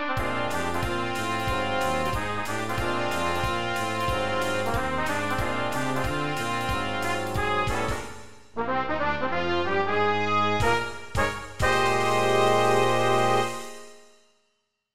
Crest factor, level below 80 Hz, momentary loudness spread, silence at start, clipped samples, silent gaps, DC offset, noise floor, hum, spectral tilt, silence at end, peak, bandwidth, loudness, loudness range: 16 dB; -42 dBFS; 7 LU; 0 s; under 0.1%; none; 2%; -75 dBFS; none; -4.5 dB/octave; 0 s; -10 dBFS; 16 kHz; -26 LUFS; 4 LU